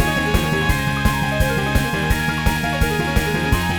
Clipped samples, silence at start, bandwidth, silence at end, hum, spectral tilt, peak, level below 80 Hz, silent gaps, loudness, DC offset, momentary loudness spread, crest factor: under 0.1%; 0 s; 19.5 kHz; 0 s; none; -5 dB/octave; -2 dBFS; -26 dBFS; none; -19 LUFS; 0.3%; 1 LU; 16 dB